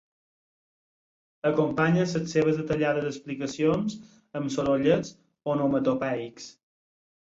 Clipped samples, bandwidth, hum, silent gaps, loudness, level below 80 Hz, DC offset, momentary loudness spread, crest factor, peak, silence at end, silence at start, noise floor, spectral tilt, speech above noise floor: under 0.1%; 7.8 kHz; none; none; -26 LUFS; -60 dBFS; under 0.1%; 15 LU; 20 dB; -8 dBFS; 0.85 s; 1.45 s; under -90 dBFS; -6.5 dB/octave; over 64 dB